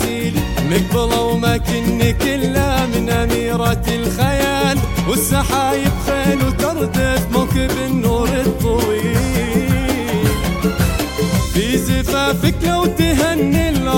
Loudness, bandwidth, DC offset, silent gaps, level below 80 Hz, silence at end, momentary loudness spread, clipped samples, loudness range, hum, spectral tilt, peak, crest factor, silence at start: -16 LUFS; 17 kHz; under 0.1%; none; -26 dBFS; 0 s; 2 LU; under 0.1%; 1 LU; none; -5.5 dB/octave; -2 dBFS; 14 dB; 0 s